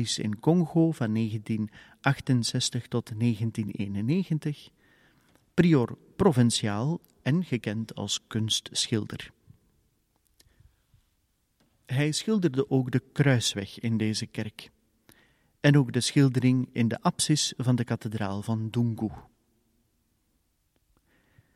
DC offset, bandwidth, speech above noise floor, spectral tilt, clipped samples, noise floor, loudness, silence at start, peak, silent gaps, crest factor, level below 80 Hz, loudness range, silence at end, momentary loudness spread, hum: under 0.1%; 14 kHz; 46 dB; -5.5 dB/octave; under 0.1%; -73 dBFS; -27 LUFS; 0 s; -6 dBFS; none; 22 dB; -60 dBFS; 8 LU; 2.35 s; 10 LU; none